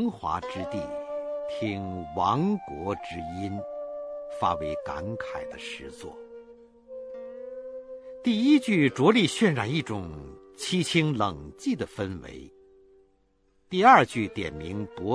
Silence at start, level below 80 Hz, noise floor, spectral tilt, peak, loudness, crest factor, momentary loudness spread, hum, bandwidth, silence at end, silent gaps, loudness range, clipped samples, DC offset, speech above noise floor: 0 s; -56 dBFS; -66 dBFS; -5.5 dB/octave; -4 dBFS; -27 LUFS; 24 dB; 20 LU; none; 11 kHz; 0 s; none; 9 LU; under 0.1%; under 0.1%; 40 dB